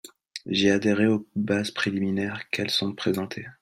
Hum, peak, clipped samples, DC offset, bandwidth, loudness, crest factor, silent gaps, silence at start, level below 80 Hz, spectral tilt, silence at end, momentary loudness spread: none; -6 dBFS; under 0.1%; under 0.1%; 14.5 kHz; -25 LUFS; 18 dB; none; 0.05 s; -64 dBFS; -5 dB/octave; 0.1 s; 8 LU